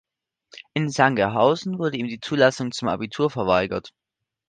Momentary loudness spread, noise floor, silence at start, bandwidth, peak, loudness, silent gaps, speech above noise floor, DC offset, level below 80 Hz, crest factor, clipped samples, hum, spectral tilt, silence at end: 9 LU; -56 dBFS; 0.55 s; 9.8 kHz; -2 dBFS; -22 LUFS; none; 34 dB; under 0.1%; -56 dBFS; 22 dB; under 0.1%; none; -5.5 dB/octave; 0.6 s